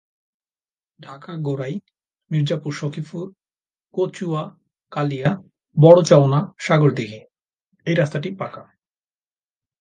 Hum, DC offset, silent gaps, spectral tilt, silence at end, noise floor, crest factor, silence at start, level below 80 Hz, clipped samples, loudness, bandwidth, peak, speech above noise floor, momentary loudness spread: none; under 0.1%; 7.53-7.58 s, 7.66-7.70 s; -7 dB/octave; 1.2 s; under -90 dBFS; 20 dB; 1 s; -64 dBFS; under 0.1%; -19 LUFS; 9.4 kHz; 0 dBFS; over 71 dB; 20 LU